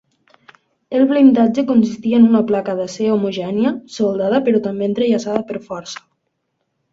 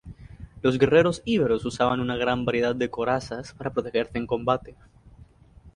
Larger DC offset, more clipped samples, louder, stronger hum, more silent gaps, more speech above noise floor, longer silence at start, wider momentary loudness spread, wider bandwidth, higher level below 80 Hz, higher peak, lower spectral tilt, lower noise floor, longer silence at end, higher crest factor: neither; neither; first, -16 LUFS vs -25 LUFS; neither; neither; first, 56 dB vs 28 dB; first, 0.9 s vs 0.05 s; about the same, 14 LU vs 12 LU; second, 7.6 kHz vs 11 kHz; second, -60 dBFS vs -50 dBFS; first, 0 dBFS vs -6 dBFS; about the same, -6.5 dB/octave vs -6 dB/octave; first, -71 dBFS vs -52 dBFS; first, 0.95 s vs 0.05 s; about the same, 16 dB vs 20 dB